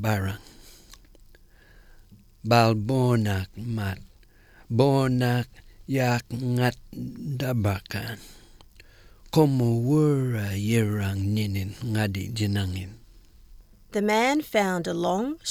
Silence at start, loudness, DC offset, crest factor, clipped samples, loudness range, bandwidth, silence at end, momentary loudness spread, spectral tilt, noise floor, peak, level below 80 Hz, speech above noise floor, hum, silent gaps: 0 s; -25 LUFS; under 0.1%; 20 dB; under 0.1%; 4 LU; 17.5 kHz; 0 s; 12 LU; -6.5 dB/octave; -54 dBFS; -6 dBFS; -52 dBFS; 30 dB; none; none